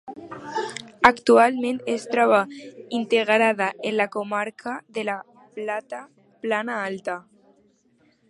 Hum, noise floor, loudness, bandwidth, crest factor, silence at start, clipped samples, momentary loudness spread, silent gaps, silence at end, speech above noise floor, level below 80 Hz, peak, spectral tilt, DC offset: none; -62 dBFS; -23 LUFS; 11.5 kHz; 24 dB; 0.05 s; under 0.1%; 17 LU; none; 1.1 s; 40 dB; -62 dBFS; 0 dBFS; -4 dB/octave; under 0.1%